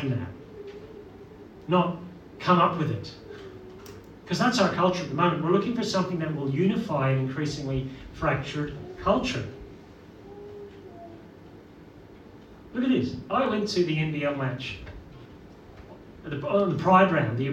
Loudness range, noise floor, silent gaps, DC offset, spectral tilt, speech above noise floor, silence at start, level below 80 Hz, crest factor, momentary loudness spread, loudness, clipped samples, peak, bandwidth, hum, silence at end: 8 LU; -48 dBFS; none; under 0.1%; -6.5 dB/octave; 23 dB; 0 s; -52 dBFS; 22 dB; 23 LU; -26 LUFS; under 0.1%; -6 dBFS; 10 kHz; none; 0 s